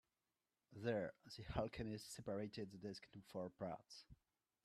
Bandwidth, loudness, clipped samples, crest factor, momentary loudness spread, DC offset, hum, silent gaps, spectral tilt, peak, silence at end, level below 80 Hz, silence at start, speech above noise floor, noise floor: 13.5 kHz; -50 LUFS; under 0.1%; 22 dB; 14 LU; under 0.1%; none; none; -5.5 dB/octave; -28 dBFS; 0.5 s; -68 dBFS; 0.7 s; over 41 dB; under -90 dBFS